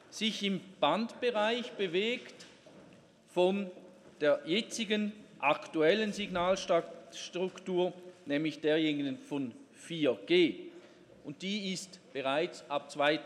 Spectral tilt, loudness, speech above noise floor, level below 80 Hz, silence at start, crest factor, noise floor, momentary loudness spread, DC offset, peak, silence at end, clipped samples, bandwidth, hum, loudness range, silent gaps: -4.5 dB/octave; -33 LUFS; 27 dB; -74 dBFS; 0.1 s; 20 dB; -59 dBFS; 14 LU; under 0.1%; -14 dBFS; 0 s; under 0.1%; 12.5 kHz; none; 3 LU; none